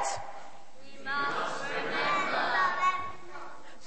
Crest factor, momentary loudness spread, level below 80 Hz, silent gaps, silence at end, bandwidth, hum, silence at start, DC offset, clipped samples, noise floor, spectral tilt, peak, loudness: 16 dB; 18 LU; -68 dBFS; none; 0 s; 8.4 kHz; none; 0 s; 1%; under 0.1%; -53 dBFS; -2 dB/octave; -16 dBFS; -30 LUFS